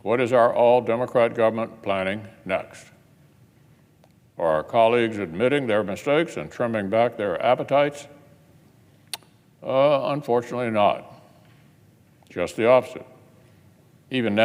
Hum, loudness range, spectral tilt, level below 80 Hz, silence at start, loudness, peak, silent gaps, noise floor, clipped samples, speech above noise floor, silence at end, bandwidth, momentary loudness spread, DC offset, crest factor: none; 4 LU; -6 dB/octave; -64 dBFS; 0.05 s; -22 LUFS; -4 dBFS; none; -57 dBFS; under 0.1%; 35 dB; 0 s; 15.5 kHz; 15 LU; under 0.1%; 20 dB